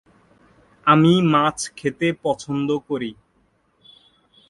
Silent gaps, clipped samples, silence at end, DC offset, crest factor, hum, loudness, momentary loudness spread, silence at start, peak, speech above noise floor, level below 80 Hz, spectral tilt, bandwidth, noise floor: none; under 0.1%; 1.35 s; under 0.1%; 22 dB; none; -20 LUFS; 12 LU; 0.85 s; 0 dBFS; 44 dB; -60 dBFS; -5.5 dB/octave; 11.5 kHz; -63 dBFS